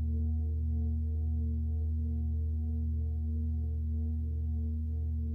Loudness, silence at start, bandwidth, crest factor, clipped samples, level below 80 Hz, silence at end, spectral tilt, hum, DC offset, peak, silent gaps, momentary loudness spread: -34 LUFS; 0 s; 0.8 kHz; 6 dB; under 0.1%; -34 dBFS; 0 s; -12.5 dB/octave; none; under 0.1%; -26 dBFS; none; 2 LU